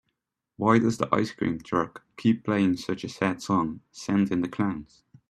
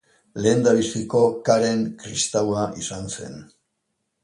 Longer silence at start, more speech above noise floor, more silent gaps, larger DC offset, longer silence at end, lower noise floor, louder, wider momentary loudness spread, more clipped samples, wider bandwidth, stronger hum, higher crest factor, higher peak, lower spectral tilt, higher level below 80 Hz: first, 0.6 s vs 0.35 s; about the same, 55 dB vs 54 dB; neither; neither; second, 0.45 s vs 0.8 s; first, -80 dBFS vs -76 dBFS; second, -26 LUFS vs -22 LUFS; second, 9 LU vs 15 LU; neither; about the same, 12.5 kHz vs 11.5 kHz; neither; about the same, 20 dB vs 20 dB; about the same, -6 dBFS vs -4 dBFS; first, -6.5 dB/octave vs -4.5 dB/octave; about the same, -60 dBFS vs -56 dBFS